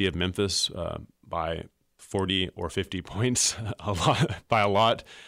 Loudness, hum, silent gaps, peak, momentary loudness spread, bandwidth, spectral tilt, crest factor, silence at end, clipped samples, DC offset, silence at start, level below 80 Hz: -27 LUFS; none; none; -10 dBFS; 11 LU; 16 kHz; -3.5 dB/octave; 16 dB; 0 s; under 0.1%; under 0.1%; 0 s; -50 dBFS